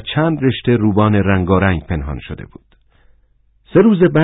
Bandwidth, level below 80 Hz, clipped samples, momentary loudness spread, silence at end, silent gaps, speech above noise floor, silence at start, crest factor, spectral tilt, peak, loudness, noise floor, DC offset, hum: 4 kHz; -32 dBFS; under 0.1%; 15 LU; 0 s; none; 41 dB; 0 s; 14 dB; -13 dB/octave; -2 dBFS; -15 LUFS; -55 dBFS; under 0.1%; none